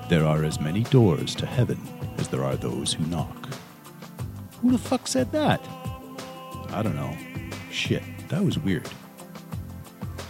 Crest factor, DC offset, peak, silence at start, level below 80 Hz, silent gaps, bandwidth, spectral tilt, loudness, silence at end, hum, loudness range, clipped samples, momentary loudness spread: 22 dB; under 0.1%; -4 dBFS; 0 s; -48 dBFS; none; 16.5 kHz; -6 dB/octave; -26 LUFS; 0 s; none; 4 LU; under 0.1%; 16 LU